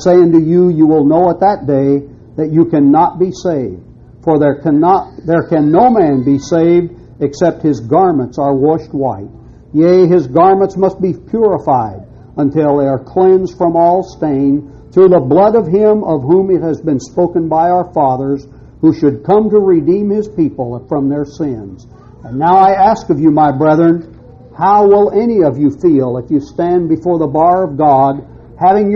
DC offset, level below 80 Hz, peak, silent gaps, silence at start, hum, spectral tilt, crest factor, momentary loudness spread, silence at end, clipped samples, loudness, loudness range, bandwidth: under 0.1%; -42 dBFS; 0 dBFS; none; 0 s; none; -9 dB/octave; 10 dB; 9 LU; 0 s; under 0.1%; -11 LUFS; 3 LU; 7.4 kHz